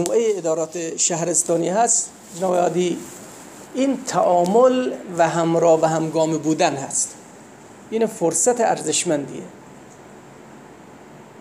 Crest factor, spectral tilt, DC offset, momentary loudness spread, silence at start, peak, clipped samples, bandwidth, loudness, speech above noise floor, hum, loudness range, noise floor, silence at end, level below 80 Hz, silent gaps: 18 dB; -4 dB/octave; under 0.1%; 14 LU; 0 s; -4 dBFS; under 0.1%; 16 kHz; -19 LUFS; 23 dB; none; 4 LU; -43 dBFS; 0 s; -68 dBFS; none